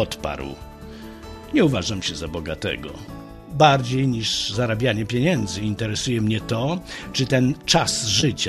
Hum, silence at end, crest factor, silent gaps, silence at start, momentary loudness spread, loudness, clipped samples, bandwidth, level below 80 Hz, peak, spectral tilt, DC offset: none; 0 s; 20 dB; none; 0 s; 20 LU; -22 LUFS; under 0.1%; 13.5 kHz; -44 dBFS; -2 dBFS; -4.5 dB/octave; under 0.1%